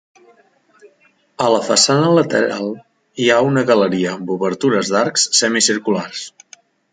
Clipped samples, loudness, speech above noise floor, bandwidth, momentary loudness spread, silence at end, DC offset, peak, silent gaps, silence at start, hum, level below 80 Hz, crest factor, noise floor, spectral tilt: under 0.1%; -15 LUFS; 41 dB; 9.6 kHz; 14 LU; 0.65 s; under 0.1%; 0 dBFS; none; 1.4 s; none; -62 dBFS; 16 dB; -57 dBFS; -3.5 dB/octave